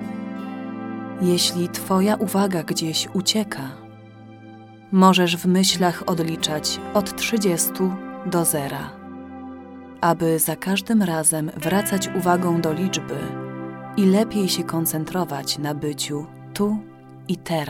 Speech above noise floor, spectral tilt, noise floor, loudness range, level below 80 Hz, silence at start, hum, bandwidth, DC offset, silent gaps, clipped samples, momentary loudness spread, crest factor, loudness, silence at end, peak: 22 dB; -4.5 dB/octave; -43 dBFS; 3 LU; -58 dBFS; 0 s; none; 17.5 kHz; under 0.1%; none; under 0.1%; 14 LU; 20 dB; -22 LUFS; 0 s; -2 dBFS